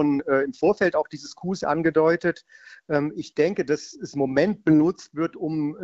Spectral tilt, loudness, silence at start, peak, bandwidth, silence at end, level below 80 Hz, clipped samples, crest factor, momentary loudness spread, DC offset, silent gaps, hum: -6.5 dB/octave; -24 LUFS; 0 s; -8 dBFS; 7.8 kHz; 0 s; -60 dBFS; under 0.1%; 16 dB; 9 LU; under 0.1%; none; none